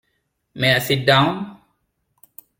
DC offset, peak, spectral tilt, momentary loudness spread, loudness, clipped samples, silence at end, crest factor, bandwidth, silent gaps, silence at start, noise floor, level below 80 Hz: under 0.1%; -2 dBFS; -5 dB/octave; 14 LU; -17 LUFS; under 0.1%; 1.05 s; 20 dB; 17 kHz; none; 0.55 s; -71 dBFS; -56 dBFS